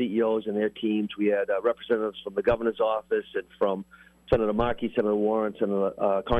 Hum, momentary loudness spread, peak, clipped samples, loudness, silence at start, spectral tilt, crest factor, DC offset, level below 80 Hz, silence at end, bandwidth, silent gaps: none; 4 LU; -10 dBFS; under 0.1%; -27 LUFS; 0 s; -8 dB/octave; 16 dB; under 0.1%; -48 dBFS; 0 s; 11 kHz; none